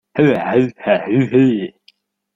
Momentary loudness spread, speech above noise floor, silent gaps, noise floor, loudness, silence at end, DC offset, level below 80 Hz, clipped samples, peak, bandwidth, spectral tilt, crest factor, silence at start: 6 LU; 41 dB; none; -55 dBFS; -16 LUFS; 0.65 s; under 0.1%; -56 dBFS; under 0.1%; -2 dBFS; 7.4 kHz; -8.5 dB/octave; 16 dB; 0.15 s